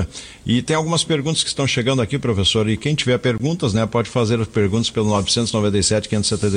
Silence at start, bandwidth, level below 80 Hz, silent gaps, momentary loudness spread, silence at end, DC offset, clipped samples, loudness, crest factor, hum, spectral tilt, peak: 0 s; 10.5 kHz; -42 dBFS; none; 3 LU; 0 s; under 0.1%; under 0.1%; -19 LUFS; 14 dB; none; -4.5 dB/octave; -4 dBFS